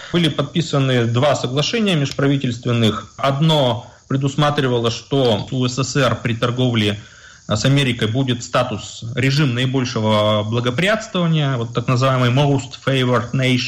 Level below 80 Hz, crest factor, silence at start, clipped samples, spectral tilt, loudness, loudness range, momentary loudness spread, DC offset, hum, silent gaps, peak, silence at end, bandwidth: -50 dBFS; 10 dB; 0 s; under 0.1%; -5.5 dB/octave; -18 LUFS; 1 LU; 5 LU; under 0.1%; none; none; -6 dBFS; 0 s; 11.5 kHz